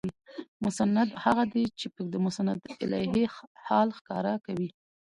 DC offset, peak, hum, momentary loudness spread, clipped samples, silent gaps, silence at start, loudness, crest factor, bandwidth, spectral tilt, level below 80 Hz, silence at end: under 0.1%; -10 dBFS; none; 11 LU; under 0.1%; 0.48-0.60 s, 3.47-3.55 s, 4.01-4.05 s; 0.05 s; -29 LUFS; 20 dB; 11.5 kHz; -6 dB/octave; -62 dBFS; 0.45 s